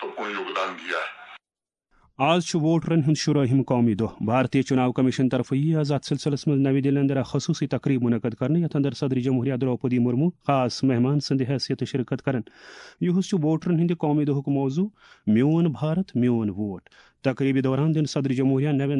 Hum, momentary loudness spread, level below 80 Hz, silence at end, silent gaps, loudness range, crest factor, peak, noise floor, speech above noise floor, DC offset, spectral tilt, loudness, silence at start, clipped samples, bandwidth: none; 7 LU; -62 dBFS; 0 s; none; 3 LU; 16 dB; -8 dBFS; under -90 dBFS; over 67 dB; under 0.1%; -7 dB/octave; -24 LUFS; 0 s; under 0.1%; 10.5 kHz